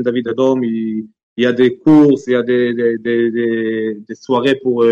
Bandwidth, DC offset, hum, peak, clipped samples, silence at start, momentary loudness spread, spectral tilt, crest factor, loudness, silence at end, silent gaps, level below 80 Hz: 7.6 kHz; under 0.1%; none; -2 dBFS; under 0.1%; 0 s; 12 LU; -7 dB/octave; 12 dB; -15 LUFS; 0 s; 1.23-1.36 s; -60 dBFS